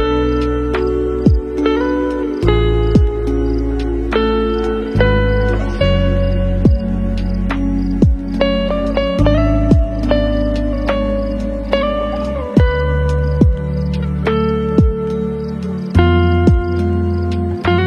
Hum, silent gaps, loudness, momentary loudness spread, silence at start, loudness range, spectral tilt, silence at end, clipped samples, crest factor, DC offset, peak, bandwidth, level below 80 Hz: none; none; -16 LUFS; 6 LU; 0 s; 1 LU; -8.5 dB/octave; 0 s; under 0.1%; 14 dB; under 0.1%; 0 dBFS; 7 kHz; -20 dBFS